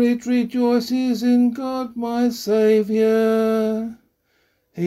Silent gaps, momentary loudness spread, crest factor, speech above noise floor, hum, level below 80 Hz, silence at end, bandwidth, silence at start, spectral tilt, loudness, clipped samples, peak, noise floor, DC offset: none; 9 LU; 12 dB; 47 dB; none; -62 dBFS; 0 s; 15 kHz; 0 s; -6 dB/octave; -19 LUFS; under 0.1%; -8 dBFS; -65 dBFS; under 0.1%